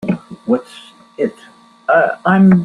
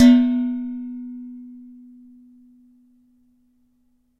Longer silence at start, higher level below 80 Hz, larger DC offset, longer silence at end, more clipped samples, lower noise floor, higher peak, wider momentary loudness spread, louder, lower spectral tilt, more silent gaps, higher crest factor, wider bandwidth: about the same, 0.05 s vs 0 s; first, -54 dBFS vs -62 dBFS; neither; second, 0 s vs 2.65 s; neither; second, -44 dBFS vs -64 dBFS; about the same, -2 dBFS vs -2 dBFS; second, 16 LU vs 27 LU; first, -16 LUFS vs -21 LUFS; first, -9 dB/octave vs -5 dB/octave; neither; second, 14 dB vs 20 dB; second, 4.7 kHz vs 7.4 kHz